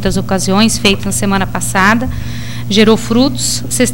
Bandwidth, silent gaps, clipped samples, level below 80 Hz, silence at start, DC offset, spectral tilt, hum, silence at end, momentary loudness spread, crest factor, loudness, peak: 17 kHz; none; under 0.1%; -28 dBFS; 0 s; 7%; -4 dB/octave; none; 0 s; 8 LU; 14 dB; -12 LUFS; 0 dBFS